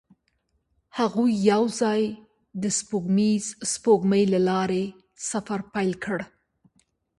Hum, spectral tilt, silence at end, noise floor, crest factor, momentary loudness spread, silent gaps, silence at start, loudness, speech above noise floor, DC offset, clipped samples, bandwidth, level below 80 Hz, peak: none; -5 dB/octave; 0.95 s; -72 dBFS; 18 dB; 12 LU; none; 0.95 s; -24 LUFS; 49 dB; under 0.1%; under 0.1%; 11.5 kHz; -64 dBFS; -8 dBFS